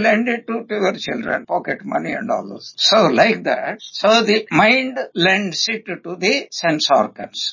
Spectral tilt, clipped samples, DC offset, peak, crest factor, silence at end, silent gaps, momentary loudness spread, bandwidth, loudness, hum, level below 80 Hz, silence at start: -3.5 dB/octave; under 0.1%; under 0.1%; -2 dBFS; 16 dB; 0 s; none; 11 LU; 7.4 kHz; -17 LUFS; none; -62 dBFS; 0 s